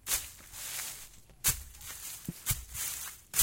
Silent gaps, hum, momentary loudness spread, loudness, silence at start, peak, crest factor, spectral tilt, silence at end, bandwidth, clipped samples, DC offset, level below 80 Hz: none; none; 14 LU; -35 LUFS; 0.05 s; -8 dBFS; 28 dB; -1 dB/octave; 0 s; 17 kHz; under 0.1%; under 0.1%; -52 dBFS